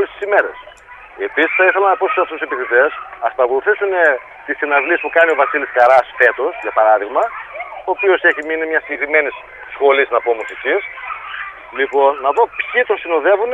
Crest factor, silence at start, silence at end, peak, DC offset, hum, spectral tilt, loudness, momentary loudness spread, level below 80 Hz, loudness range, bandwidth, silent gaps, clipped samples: 16 dB; 0 s; 0 s; 0 dBFS; under 0.1%; none; -4 dB/octave; -15 LUFS; 13 LU; -56 dBFS; 3 LU; 8 kHz; none; under 0.1%